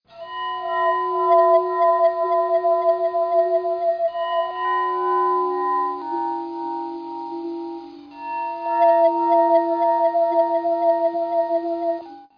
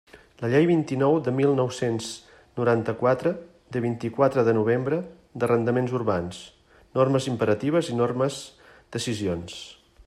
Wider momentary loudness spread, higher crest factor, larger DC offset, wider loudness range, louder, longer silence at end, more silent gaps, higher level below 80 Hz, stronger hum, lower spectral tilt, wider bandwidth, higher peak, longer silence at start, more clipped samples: about the same, 13 LU vs 15 LU; about the same, 14 dB vs 18 dB; neither; first, 6 LU vs 2 LU; first, -20 LUFS vs -24 LUFS; about the same, 0.15 s vs 0.05 s; neither; second, -70 dBFS vs -62 dBFS; neither; about the same, -6 dB/octave vs -6.5 dB/octave; second, 5.2 kHz vs 13 kHz; about the same, -6 dBFS vs -6 dBFS; about the same, 0.15 s vs 0.15 s; neither